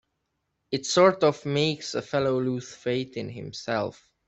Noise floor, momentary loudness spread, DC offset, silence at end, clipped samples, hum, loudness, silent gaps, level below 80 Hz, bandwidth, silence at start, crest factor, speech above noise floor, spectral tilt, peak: -78 dBFS; 15 LU; under 0.1%; 0.35 s; under 0.1%; none; -26 LUFS; none; -64 dBFS; 8.2 kHz; 0.7 s; 22 dB; 53 dB; -5 dB/octave; -6 dBFS